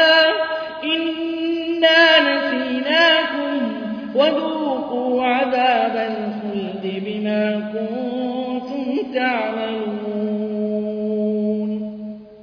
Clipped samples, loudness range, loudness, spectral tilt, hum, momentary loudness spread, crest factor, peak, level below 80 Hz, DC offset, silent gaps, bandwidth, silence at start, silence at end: under 0.1%; 7 LU; -19 LUFS; -5.5 dB/octave; none; 12 LU; 18 dB; -2 dBFS; -64 dBFS; under 0.1%; none; 5.4 kHz; 0 s; 0 s